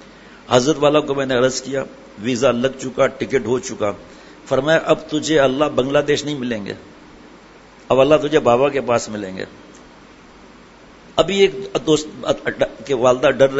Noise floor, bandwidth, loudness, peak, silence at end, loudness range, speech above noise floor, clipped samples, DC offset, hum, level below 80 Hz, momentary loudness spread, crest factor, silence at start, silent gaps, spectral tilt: -44 dBFS; 8 kHz; -18 LUFS; 0 dBFS; 0 s; 3 LU; 27 dB; under 0.1%; under 0.1%; none; -48 dBFS; 12 LU; 18 dB; 0 s; none; -4.5 dB/octave